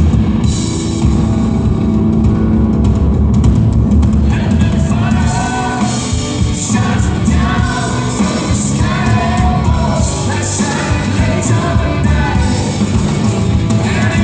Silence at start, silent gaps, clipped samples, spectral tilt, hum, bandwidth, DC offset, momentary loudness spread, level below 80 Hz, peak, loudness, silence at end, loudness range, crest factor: 0 s; none; under 0.1%; -6 dB/octave; none; 8 kHz; under 0.1%; 4 LU; -18 dBFS; 0 dBFS; -13 LUFS; 0 s; 2 LU; 12 dB